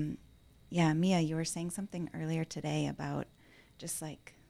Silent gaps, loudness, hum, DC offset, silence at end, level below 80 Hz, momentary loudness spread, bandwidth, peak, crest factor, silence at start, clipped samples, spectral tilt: none; -35 LUFS; none; under 0.1%; 0.2 s; -64 dBFS; 13 LU; 14.5 kHz; -16 dBFS; 20 dB; 0 s; under 0.1%; -5.5 dB/octave